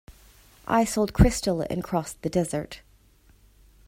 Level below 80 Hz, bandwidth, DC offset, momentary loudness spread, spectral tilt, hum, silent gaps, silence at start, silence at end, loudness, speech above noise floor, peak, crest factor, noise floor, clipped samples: -36 dBFS; 16 kHz; under 0.1%; 17 LU; -6 dB/octave; none; none; 0.1 s; 1.1 s; -25 LUFS; 34 dB; -6 dBFS; 22 dB; -58 dBFS; under 0.1%